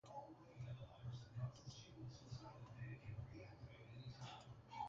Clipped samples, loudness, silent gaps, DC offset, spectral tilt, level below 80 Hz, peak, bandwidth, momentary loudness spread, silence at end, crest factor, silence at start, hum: under 0.1%; -56 LUFS; none; under 0.1%; -5.5 dB/octave; -70 dBFS; -36 dBFS; 7.4 kHz; 7 LU; 0 s; 18 dB; 0.05 s; none